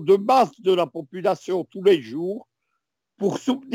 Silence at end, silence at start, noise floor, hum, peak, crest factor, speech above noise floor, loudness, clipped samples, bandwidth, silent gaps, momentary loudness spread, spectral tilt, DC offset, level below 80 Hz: 0 s; 0 s; -79 dBFS; none; -6 dBFS; 16 dB; 58 dB; -22 LUFS; under 0.1%; 16 kHz; none; 11 LU; -6 dB/octave; under 0.1%; -76 dBFS